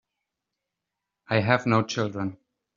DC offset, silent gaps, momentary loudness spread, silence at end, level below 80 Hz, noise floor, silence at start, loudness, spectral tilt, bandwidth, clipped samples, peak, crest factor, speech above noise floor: under 0.1%; none; 11 LU; 0.4 s; -66 dBFS; -85 dBFS; 1.3 s; -25 LUFS; -5 dB/octave; 7.4 kHz; under 0.1%; -2 dBFS; 26 dB; 61 dB